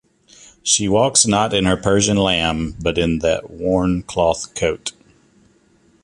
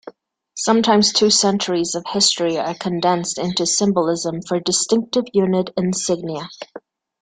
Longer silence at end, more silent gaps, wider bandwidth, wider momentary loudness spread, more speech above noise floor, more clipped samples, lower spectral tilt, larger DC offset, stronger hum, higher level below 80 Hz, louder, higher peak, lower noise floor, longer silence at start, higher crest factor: first, 1.15 s vs 0.4 s; neither; first, 11.5 kHz vs 9.8 kHz; about the same, 8 LU vs 10 LU; first, 38 dB vs 24 dB; neither; about the same, -3.5 dB/octave vs -3.5 dB/octave; neither; neither; first, -38 dBFS vs -58 dBFS; about the same, -17 LUFS vs -18 LUFS; about the same, 0 dBFS vs -2 dBFS; first, -56 dBFS vs -43 dBFS; first, 0.65 s vs 0.05 s; about the same, 18 dB vs 18 dB